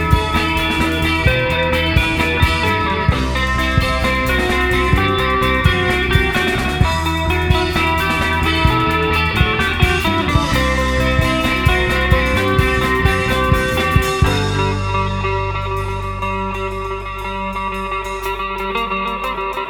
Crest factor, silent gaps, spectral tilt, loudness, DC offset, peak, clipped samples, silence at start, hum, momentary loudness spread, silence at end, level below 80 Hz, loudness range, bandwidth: 16 dB; none; -5.5 dB/octave; -16 LUFS; under 0.1%; 0 dBFS; under 0.1%; 0 s; none; 7 LU; 0 s; -24 dBFS; 6 LU; 19.5 kHz